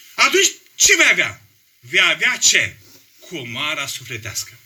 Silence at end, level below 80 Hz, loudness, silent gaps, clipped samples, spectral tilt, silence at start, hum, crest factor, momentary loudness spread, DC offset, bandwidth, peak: 0.15 s; -56 dBFS; -15 LUFS; none; under 0.1%; 0 dB/octave; 0.15 s; none; 18 dB; 15 LU; under 0.1%; over 20 kHz; 0 dBFS